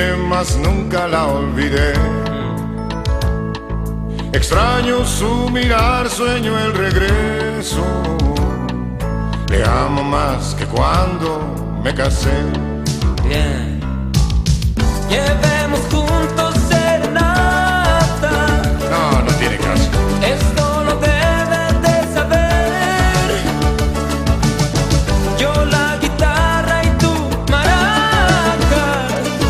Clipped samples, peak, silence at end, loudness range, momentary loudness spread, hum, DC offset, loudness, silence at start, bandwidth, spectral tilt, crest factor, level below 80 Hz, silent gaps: under 0.1%; 0 dBFS; 0 s; 3 LU; 7 LU; none; under 0.1%; -16 LUFS; 0 s; 15 kHz; -5 dB/octave; 14 dB; -20 dBFS; none